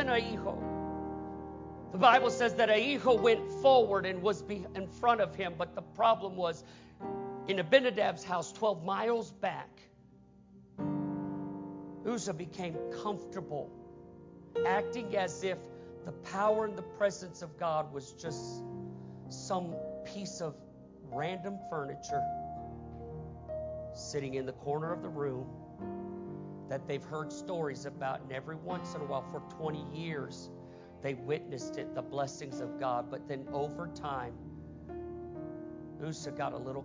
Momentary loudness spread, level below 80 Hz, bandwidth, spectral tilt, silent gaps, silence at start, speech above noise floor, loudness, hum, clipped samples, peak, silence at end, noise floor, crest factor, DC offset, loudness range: 18 LU; -60 dBFS; 7.6 kHz; -5 dB/octave; none; 0 s; 26 dB; -34 LUFS; none; under 0.1%; -10 dBFS; 0 s; -59 dBFS; 24 dB; under 0.1%; 11 LU